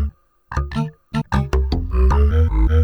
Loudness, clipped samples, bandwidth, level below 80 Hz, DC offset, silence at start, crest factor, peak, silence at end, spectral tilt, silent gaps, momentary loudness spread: -20 LUFS; under 0.1%; 6.6 kHz; -18 dBFS; under 0.1%; 0 s; 12 dB; -4 dBFS; 0 s; -8 dB/octave; none; 11 LU